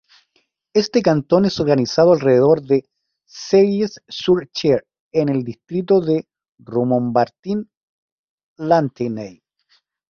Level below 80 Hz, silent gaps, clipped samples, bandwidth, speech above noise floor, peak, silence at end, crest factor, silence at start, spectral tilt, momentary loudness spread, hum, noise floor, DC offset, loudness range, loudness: -56 dBFS; 5.00-5.11 s, 6.49-6.53 s, 7.39-7.43 s, 7.77-8.56 s; under 0.1%; 7 kHz; 49 dB; 0 dBFS; 0.8 s; 18 dB; 0.75 s; -6.5 dB/octave; 11 LU; none; -66 dBFS; under 0.1%; 5 LU; -18 LUFS